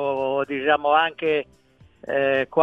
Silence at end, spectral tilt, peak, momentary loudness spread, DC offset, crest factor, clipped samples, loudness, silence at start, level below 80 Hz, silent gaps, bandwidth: 0 s; -6.5 dB/octave; -2 dBFS; 9 LU; under 0.1%; 20 dB; under 0.1%; -22 LUFS; 0 s; -62 dBFS; none; 5.8 kHz